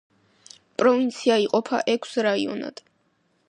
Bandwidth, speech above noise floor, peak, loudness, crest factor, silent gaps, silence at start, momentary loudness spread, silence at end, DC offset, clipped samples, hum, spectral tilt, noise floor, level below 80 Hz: 11 kHz; 45 dB; -6 dBFS; -23 LUFS; 18 dB; none; 0.8 s; 12 LU; 0.8 s; under 0.1%; under 0.1%; none; -4 dB/octave; -68 dBFS; -76 dBFS